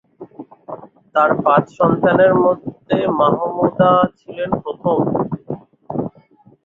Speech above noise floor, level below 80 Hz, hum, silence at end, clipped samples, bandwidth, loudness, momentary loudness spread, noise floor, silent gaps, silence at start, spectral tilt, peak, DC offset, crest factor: 34 dB; -54 dBFS; none; 0.55 s; under 0.1%; 7 kHz; -17 LUFS; 21 LU; -50 dBFS; none; 0.2 s; -9 dB/octave; -2 dBFS; under 0.1%; 16 dB